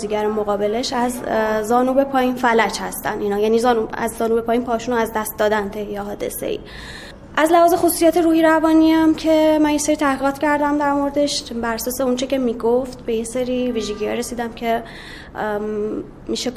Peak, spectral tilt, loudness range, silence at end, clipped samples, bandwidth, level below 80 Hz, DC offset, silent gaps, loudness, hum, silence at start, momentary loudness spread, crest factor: -2 dBFS; -4 dB/octave; 7 LU; 0 s; under 0.1%; 16 kHz; -44 dBFS; under 0.1%; none; -19 LUFS; none; 0 s; 12 LU; 16 dB